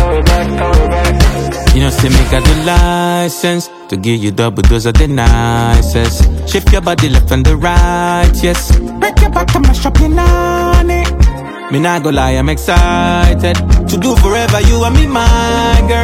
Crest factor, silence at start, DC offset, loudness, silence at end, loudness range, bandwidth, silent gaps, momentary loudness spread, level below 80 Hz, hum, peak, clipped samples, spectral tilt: 8 dB; 0 s; 0.2%; -11 LUFS; 0 s; 1 LU; 16 kHz; none; 4 LU; -12 dBFS; none; 0 dBFS; 0.5%; -5.5 dB/octave